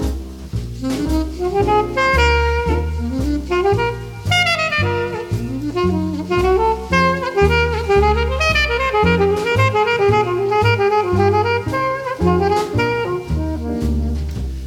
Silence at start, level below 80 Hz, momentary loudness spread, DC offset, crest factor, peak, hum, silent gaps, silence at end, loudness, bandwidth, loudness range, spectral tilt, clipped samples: 0 s; -26 dBFS; 8 LU; under 0.1%; 16 dB; -2 dBFS; none; none; 0 s; -17 LUFS; 16 kHz; 3 LU; -6 dB/octave; under 0.1%